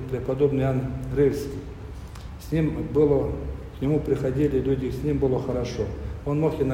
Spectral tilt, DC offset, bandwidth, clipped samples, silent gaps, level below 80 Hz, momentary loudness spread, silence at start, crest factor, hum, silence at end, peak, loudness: -8.5 dB/octave; under 0.1%; 16 kHz; under 0.1%; none; -38 dBFS; 14 LU; 0 s; 16 dB; none; 0 s; -8 dBFS; -25 LUFS